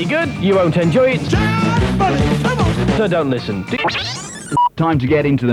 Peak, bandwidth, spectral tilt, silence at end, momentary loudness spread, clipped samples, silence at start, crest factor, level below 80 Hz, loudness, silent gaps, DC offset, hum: -4 dBFS; 13 kHz; -6.5 dB/octave; 0 s; 7 LU; under 0.1%; 0 s; 12 dB; -32 dBFS; -16 LUFS; none; under 0.1%; none